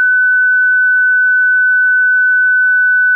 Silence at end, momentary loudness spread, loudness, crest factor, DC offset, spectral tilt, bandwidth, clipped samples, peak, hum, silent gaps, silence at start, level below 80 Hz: 0 s; 0 LU; -9 LUFS; 4 dB; under 0.1%; 8.5 dB/octave; 1.7 kHz; under 0.1%; -8 dBFS; none; none; 0 s; under -90 dBFS